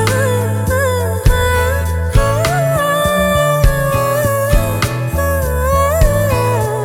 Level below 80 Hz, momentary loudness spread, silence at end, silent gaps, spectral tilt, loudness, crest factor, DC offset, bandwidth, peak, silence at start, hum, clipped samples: -20 dBFS; 3 LU; 0 s; none; -5 dB/octave; -14 LUFS; 12 dB; under 0.1%; 18 kHz; 0 dBFS; 0 s; none; under 0.1%